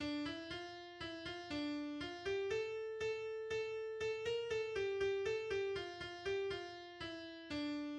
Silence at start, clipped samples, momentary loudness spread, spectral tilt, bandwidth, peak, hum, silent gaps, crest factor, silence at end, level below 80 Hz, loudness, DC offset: 0 s; under 0.1%; 8 LU; -4.5 dB/octave; 9.8 kHz; -28 dBFS; none; none; 14 dB; 0 s; -68 dBFS; -43 LUFS; under 0.1%